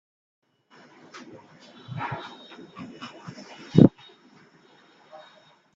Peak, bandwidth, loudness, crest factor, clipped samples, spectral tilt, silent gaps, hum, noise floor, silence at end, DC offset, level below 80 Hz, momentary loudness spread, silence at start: 0 dBFS; 7.4 kHz; -22 LUFS; 28 dB; under 0.1%; -8.5 dB/octave; none; none; -57 dBFS; 1.85 s; under 0.1%; -58 dBFS; 30 LU; 1.9 s